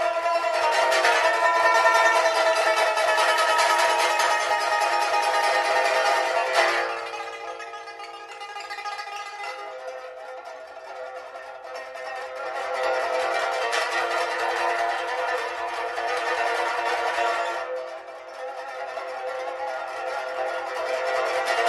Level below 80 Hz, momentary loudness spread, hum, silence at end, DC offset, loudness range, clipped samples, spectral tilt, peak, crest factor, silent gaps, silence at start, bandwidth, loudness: -70 dBFS; 17 LU; none; 0 s; under 0.1%; 15 LU; under 0.1%; 0.5 dB/octave; -6 dBFS; 18 dB; none; 0 s; 12.5 kHz; -23 LUFS